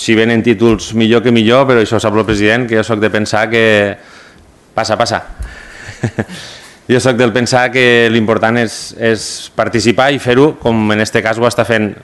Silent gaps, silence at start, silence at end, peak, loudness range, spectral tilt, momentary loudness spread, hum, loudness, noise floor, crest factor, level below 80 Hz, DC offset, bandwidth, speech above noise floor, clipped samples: none; 0 s; 0.1 s; 0 dBFS; 5 LU; -5 dB/octave; 13 LU; none; -11 LUFS; -42 dBFS; 12 dB; -38 dBFS; under 0.1%; 12.5 kHz; 31 dB; 0.3%